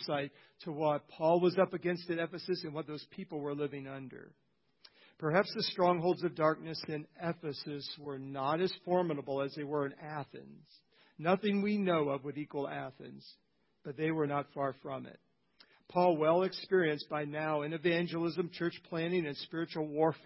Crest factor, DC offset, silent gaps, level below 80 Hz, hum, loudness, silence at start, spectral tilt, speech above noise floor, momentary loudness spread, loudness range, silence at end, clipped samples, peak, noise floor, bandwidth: 22 dB; under 0.1%; none; -78 dBFS; none; -35 LUFS; 0 s; -9.5 dB/octave; 32 dB; 14 LU; 6 LU; 0.1 s; under 0.1%; -14 dBFS; -67 dBFS; 5.8 kHz